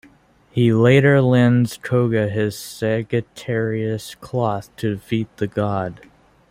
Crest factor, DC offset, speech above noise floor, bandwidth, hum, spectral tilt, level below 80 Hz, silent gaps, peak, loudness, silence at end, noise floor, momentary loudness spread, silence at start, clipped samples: 18 dB; under 0.1%; 34 dB; 15.5 kHz; none; -7 dB/octave; -54 dBFS; none; -2 dBFS; -19 LUFS; 0.55 s; -52 dBFS; 12 LU; 0.55 s; under 0.1%